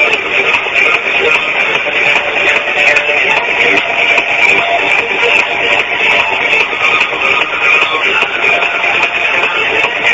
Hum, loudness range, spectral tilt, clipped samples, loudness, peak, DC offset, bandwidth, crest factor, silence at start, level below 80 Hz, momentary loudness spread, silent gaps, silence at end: none; 1 LU; -2 dB/octave; 0.2%; -9 LUFS; 0 dBFS; under 0.1%; 11 kHz; 12 dB; 0 s; -48 dBFS; 2 LU; none; 0 s